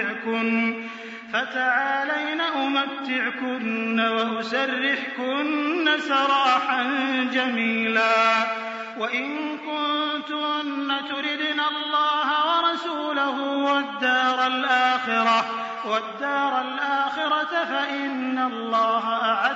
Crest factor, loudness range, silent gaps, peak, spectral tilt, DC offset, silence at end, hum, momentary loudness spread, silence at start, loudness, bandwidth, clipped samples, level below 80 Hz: 16 dB; 3 LU; none; -8 dBFS; 0 dB/octave; under 0.1%; 0 s; none; 6 LU; 0 s; -23 LUFS; 7.6 kHz; under 0.1%; -82 dBFS